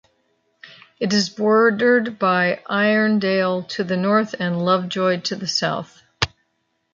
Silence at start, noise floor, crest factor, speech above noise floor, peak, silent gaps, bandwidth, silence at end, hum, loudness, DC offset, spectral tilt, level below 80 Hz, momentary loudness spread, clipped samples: 0.65 s; -71 dBFS; 18 dB; 52 dB; -2 dBFS; none; 7.6 kHz; 0.65 s; none; -19 LUFS; under 0.1%; -5 dB/octave; -54 dBFS; 9 LU; under 0.1%